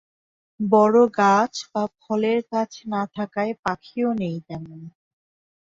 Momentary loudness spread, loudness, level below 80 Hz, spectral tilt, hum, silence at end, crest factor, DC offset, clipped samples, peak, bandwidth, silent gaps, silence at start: 15 LU; -22 LUFS; -64 dBFS; -6 dB/octave; none; 0.85 s; 20 dB; under 0.1%; under 0.1%; -4 dBFS; 7.8 kHz; 3.59-3.63 s; 0.6 s